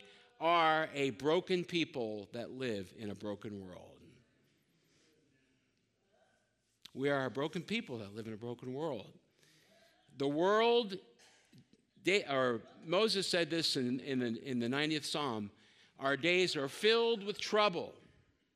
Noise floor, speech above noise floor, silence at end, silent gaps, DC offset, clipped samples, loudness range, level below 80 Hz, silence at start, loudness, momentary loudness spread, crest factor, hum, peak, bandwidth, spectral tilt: -78 dBFS; 43 dB; 0.65 s; none; under 0.1%; under 0.1%; 11 LU; -82 dBFS; 0.05 s; -35 LUFS; 15 LU; 20 dB; none; -16 dBFS; 14.5 kHz; -4.5 dB/octave